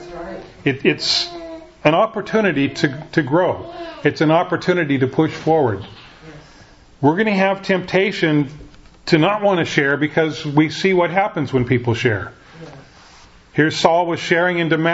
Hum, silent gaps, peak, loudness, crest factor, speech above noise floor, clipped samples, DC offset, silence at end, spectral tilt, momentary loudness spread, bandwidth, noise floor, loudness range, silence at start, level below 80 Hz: none; none; 0 dBFS; -18 LUFS; 18 dB; 28 dB; under 0.1%; under 0.1%; 0 s; -6 dB/octave; 12 LU; 8 kHz; -45 dBFS; 2 LU; 0 s; -50 dBFS